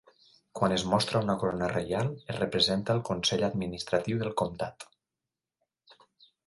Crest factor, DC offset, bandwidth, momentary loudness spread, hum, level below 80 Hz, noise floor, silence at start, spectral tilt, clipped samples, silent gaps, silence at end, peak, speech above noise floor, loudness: 20 dB; under 0.1%; 11.5 kHz; 10 LU; none; -58 dBFS; -89 dBFS; 0.55 s; -5 dB/octave; under 0.1%; none; 0.55 s; -10 dBFS; 60 dB; -29 LUFS